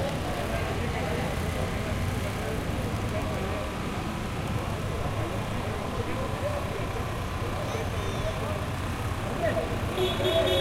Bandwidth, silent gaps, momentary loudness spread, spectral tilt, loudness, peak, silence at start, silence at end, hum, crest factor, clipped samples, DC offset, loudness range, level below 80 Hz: 16 kHz; none; 4 LU; -5.5 dB/octave; -30 LUFS; -12 dBFS; 0 s; 0 s; none; 16 dB; under 0.1%; under 0.1%; 1 LU; -38 dBFS